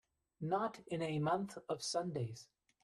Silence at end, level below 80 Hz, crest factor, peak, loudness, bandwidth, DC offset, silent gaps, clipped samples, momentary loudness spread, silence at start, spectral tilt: 0.4 s; -76 dBFS; 18 dB; -22 dBFS; -40 LUFS; 12.5 kHz; under 0.1%; none; under 0.1%; 9 LU; 0.4 s; -5.5 dB/octave